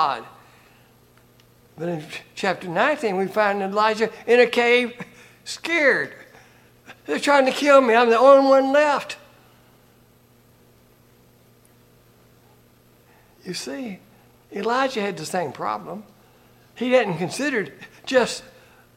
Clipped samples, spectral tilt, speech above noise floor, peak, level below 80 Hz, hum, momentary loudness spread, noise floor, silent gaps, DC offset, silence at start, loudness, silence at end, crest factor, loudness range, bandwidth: under 0.1%; -4 dB/octave; 35 dB; -2 dBFS; -66 dBFS; none; 21 LU; -55 dBFS; none; under 0.1%; 0 s; -20 LUFS; 0.55 s; 22 dB; 13 LU; 15.5 kHz